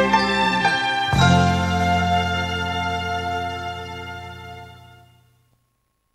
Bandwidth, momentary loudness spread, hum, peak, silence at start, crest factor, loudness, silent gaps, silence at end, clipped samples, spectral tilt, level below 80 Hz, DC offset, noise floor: 15 kHz; 18 LU; none; -4 dBFS; 0 s; 18 dB; -20 LUFS; none; 1.35 s; under 0.1%; -5 dB/octave; -42 dBFS; under 0.1%; -70 dBFS